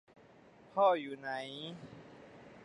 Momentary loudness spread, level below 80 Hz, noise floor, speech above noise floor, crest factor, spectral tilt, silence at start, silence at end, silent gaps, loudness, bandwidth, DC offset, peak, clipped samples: 25 LU; -78 dBFS; -60 dBFS; 26 dB; 20 dB; -5.5 dB/octave; 0.75 s; 0 s; none; -35 LUFS; 10.5 kHz; under 0.1%; -18 dBFS; under 0.1%